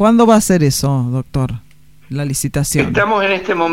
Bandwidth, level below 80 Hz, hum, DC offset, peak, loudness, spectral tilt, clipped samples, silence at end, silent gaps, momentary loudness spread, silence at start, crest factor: 16.5 kHz; -38 dBFS; none; 0.7%; 0 dBFS; -15 LUFS; -5.5 dB/octave; under 0.1%; 0 s; none; 12 LU; 0 s; 14 dB